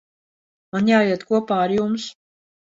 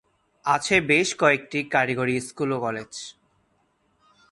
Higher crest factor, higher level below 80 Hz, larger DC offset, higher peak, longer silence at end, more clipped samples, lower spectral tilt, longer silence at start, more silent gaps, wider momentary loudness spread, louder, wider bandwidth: about the same, 18 dB vs 20 dB; about the same, -62 dBFS vs -60 dBFS; neither; about the same, -4 dBFS vs -4 dBFS; second, 0.7 s vs 1.2 s; neither; first, -6 dB/octave vs -4 dB/octave; first, 0.75 s vs 0.45 s; neither; second, 11 LU vs 15 LU; first, -20 LUFS vs -23 LUFS; second, 7.8 kHz vs 11.5 kHz